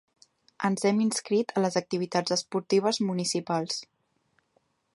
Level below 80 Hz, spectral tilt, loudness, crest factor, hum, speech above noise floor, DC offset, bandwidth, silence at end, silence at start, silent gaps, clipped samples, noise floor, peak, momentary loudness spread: -76 dBFS; -4.5 dB/octave; -28 LUFS; 18 dB; none; 45 dB; under 0.1%; 11.5 kHz; 1.1 s; 0.6 s; none; under 0.1%; -72 dBFS; -10 dBFS; 5 LU